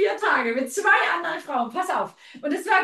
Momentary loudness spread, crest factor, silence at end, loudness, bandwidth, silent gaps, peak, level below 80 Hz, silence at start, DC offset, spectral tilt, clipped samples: 10 LU; 16 dB; 0 s; -23 LUFS; 12.5 kHz; none; -6 dBFS; -78 dBFS; 0 s; under 0.1%; -2 dB/octave; under 0.1%